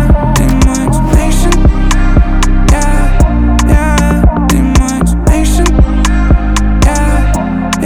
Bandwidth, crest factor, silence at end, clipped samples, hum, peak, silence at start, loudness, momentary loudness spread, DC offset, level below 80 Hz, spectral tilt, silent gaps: 14.5 kHz; 8 dB; 0 s; under 0.1%; none; 0 dBFS; 0 s; -10 LUFS; 3 LU; 2%; -10 dBFS; -5.5 dB/octave; none